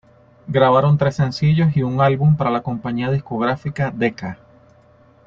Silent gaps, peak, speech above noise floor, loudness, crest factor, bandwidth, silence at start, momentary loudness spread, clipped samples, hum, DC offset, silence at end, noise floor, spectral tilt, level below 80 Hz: none; -2 dBFS; 34 dB; -18 LUFS; 16 dB; 7.2 kHz; 0.45 s; 8 LU; under 0.1%; none; under 0.1%; 0.9 s; -51 dBFS; -8.5 dB/octave; -50 dBFS